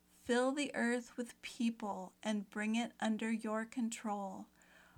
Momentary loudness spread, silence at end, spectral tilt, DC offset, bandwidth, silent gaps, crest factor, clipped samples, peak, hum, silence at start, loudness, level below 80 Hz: 11 LU; 0.5 s; -4.5 dB/octave; under 0.1%; 14 kHz; none; 16 dB; under 0.1%; -24 dBFS; none; 0.25 s; -39 LUFS; -80 dBFS